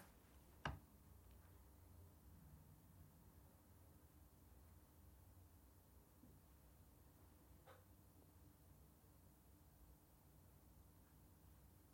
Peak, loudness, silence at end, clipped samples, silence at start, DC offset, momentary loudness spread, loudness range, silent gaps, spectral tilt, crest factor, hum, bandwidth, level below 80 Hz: -32 dBFS; -65 LUFS; 0 s; under 0.1%; 0 s; under 0.1%; 3 LU; 8 LU; none; -5 dB/octave; 34 dB; none; 16.5 kHz; -72 dBFS